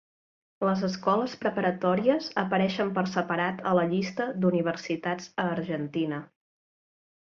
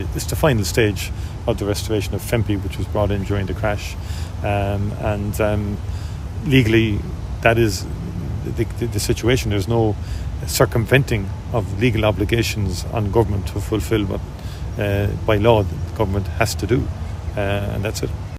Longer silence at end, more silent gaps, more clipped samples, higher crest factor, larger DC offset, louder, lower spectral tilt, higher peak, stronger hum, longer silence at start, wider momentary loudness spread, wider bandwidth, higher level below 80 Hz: first, 1.05 s vs 0 s; neither; neither; about the same, 18 dB vs 20 dB; neither; second, -28 LUFS vs -21 LUFS; about the same, -6.5 dB/octave vs -6 dB/octave; second, -10 dBFS vs 0 dBFS; neither; first, 0.6 s vs 0 s; second, 6 LU vs 10 LU; second, 7.2 kHz vs 16 kHz; second, -70 dBFS vs -30 dBFS